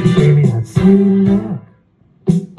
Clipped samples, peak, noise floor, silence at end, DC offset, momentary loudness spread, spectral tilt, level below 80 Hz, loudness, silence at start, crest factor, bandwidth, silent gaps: under 0.1%; -2 dBFS; -51 dBFS; 0.15 s; under 0.1%; 13 LU; -9 dB/octave; -40 dBFS; -13 LUFS; 0 s; 12 dB; 10.5 kHz; none